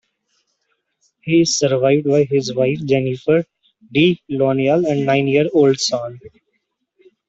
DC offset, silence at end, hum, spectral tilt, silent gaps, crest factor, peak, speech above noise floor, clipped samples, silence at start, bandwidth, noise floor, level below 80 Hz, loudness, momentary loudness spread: under 0.1%; 1 s; none; -5 dB/octave; none; 16 dB; -2 dBFS; 55 dB; under 0.1%; 1.25 s; 8.2 kHz; -71 dBFS; -58 dBFS; -17 LUFS; 6 LU